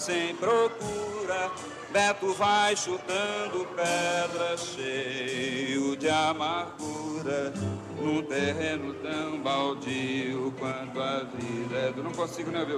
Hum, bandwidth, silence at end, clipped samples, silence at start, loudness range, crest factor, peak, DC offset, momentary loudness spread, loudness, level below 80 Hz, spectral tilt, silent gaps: none; 14 kHz; 0 s; under 0.1%; 0 s; 4 LU; 18 dB; -12 dBFS; under 0.1%; 8 LU; -29 LUFS; -66 dBFS; -4 dB/octave; none